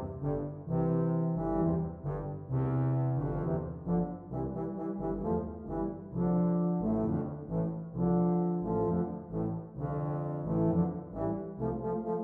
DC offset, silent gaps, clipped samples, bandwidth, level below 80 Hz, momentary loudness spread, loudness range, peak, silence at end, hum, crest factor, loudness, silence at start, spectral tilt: under 0.1%; none; under 0.1%; 2.3 kHz; -50 dBFS; 7 LU; 3 LU; -18 dBFS; 0 s; none; 14 dB; -33 LUFS; 0 s; -13 dB/octave